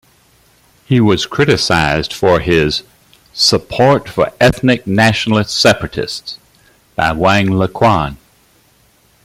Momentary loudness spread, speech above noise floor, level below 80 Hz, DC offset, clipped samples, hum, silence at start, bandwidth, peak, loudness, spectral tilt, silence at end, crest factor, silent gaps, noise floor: 10 LU; 39 dB; -38 dBFS; under 0.1%; under 0.1%; none; 0.9 s; 16 kHz; 0 dBFS; -13 LUFS; -5 dB/octave; 1.1 s; 14 dB; none; -52 dBFS